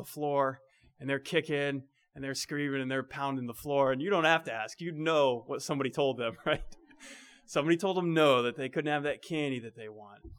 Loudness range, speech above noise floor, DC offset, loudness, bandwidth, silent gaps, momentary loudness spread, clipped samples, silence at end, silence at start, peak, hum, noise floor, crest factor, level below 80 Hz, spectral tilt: 3 LU; 22 dB; under 0.1%; -31 LUFS; 19.5 kHz; none; 16 LU; under 0.1%; 0 s; 0 s; -10 dBFS; none; -53 dBFS; 20 dB; -60 dBFS; -5 dB/octave